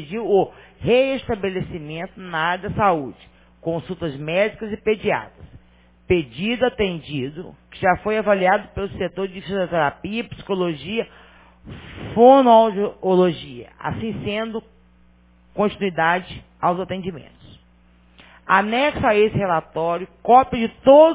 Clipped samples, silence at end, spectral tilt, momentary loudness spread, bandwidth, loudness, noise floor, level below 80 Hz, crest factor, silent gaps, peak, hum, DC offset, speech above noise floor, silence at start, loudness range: under 0.1%; 0 s; -10 dB/octave; 17 LU; 4 kHz; -20 LUFS; -54 dBFS; -46 dBFS; 20 dB; none; 0 dBFS; 60 Hz at -50 dBFS; under 0.1%; 34 dB; 0 s; 7 LU